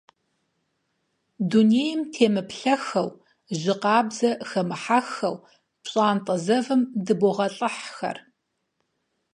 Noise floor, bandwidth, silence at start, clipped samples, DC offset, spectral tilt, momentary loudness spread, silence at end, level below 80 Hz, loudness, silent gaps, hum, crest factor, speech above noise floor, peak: -76 dBFS; 11 kHz; 1.4 s; under 0.1%; under 0.1%; -5.5 dB/octave; 11 LU; 1.15 s; -74 dBFS; -24 LUFS; none; none; 20 dB; 53 dB; -4 dBFS